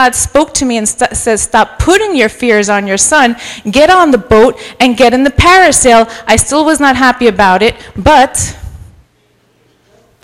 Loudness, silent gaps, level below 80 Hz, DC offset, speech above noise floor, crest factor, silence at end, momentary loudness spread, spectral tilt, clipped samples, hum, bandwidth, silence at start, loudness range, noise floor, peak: -8 LUFS; none; -28 dBFS; under 0.1%; 44 dB; 8 dB; 1.45 s; 6 LU; -3 dB/octave; 2%; none; 17 kHz; 0 s; 3 LU; -52 dBFS; 0 dBFS